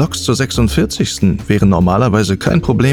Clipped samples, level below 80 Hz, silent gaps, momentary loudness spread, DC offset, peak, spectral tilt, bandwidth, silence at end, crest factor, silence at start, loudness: under 0.1%; -30 dBFS; none; 4 LU; under 0.1%; 0 dBFS; -6 dB/octave; 18 kHz; 0 s; 12 dB; 0 s; -14 LUFS